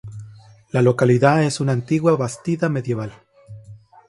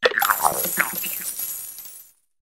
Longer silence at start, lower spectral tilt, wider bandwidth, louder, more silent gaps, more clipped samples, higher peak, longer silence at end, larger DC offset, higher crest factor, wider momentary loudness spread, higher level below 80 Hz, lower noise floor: about the same, 0.05 s vs 0 s; first, -7 dB/octave vs -0.5 dB/octave; second, 11.5 kHz vs 16.5 kHz; first, -19 LUFS vs -22 LUFS; neither; neither; about the same, -2 dBFS vs 0 dBFS; about the same, 0.35 s vs 0.4 s; neither; second, 18 dB vs 24 dB; second, 13 LU vs 18 LU; about the same, -56 dBFS vs -60 dBFS; about the same, -44 dBFS vs -47 dBFS